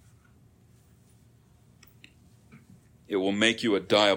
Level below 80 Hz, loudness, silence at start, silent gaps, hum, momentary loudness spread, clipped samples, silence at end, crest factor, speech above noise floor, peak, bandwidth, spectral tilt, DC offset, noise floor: -68 dBFS; -25 LUFS; 2.55 s; none; none; 7 LU; under 0.1%; 0 s; 24 dB; 35 dB; -6 dBFS; 16.5 kHz; -3.5 dB/octave; under 0.1%; -59 dBFS